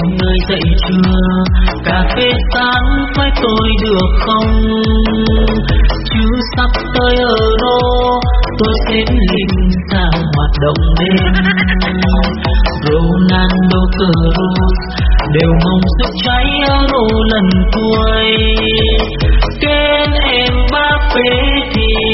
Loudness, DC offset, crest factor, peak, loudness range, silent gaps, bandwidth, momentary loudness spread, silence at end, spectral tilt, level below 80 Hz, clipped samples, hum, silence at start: -12 LUFS; under 0.1%; 10 dB; 0 dBFS; 1 LU; none; 6 kHz; 3 LU; 0 s; -4 dB/octave; -14 dBFS; under 0.1%; none; 0 s